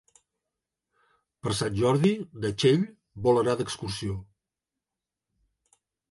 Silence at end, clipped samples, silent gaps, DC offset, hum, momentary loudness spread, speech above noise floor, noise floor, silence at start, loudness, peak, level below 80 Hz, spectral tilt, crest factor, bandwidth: 1.9 s; under 0.1%; none; under 0.1%; none; 12 LU; 63 dB; -89 dBFS; 1.45 s; -27 LUFS; -8 dBFS; -56 dBFS; -6 dB/octave; 20 dB; 11.5 kHz